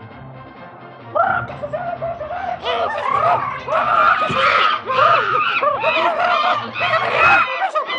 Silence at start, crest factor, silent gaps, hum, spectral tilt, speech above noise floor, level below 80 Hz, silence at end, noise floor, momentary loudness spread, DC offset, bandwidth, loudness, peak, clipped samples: 0 s; 14 dB; none; none; -4.5 dB/octave; 20 dB; -54 dBFS; 0 s; -37 dBFS; 12 LU; under 0.1%; 9.6 kHz; -17 LUFS; -4 dBFS; under 0.1%